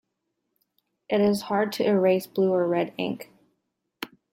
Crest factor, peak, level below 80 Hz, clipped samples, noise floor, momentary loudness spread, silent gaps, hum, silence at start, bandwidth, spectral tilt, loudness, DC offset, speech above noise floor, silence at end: 16 dB; -10 dBFS; -72 dBFS; under 0.1%; -79 dBFS; 16 LU; none; none; 1.1 s; 16.5 kHz; -6 dB/octave; -24 LUFS; under 0.1%; 56 dB; 0.25 s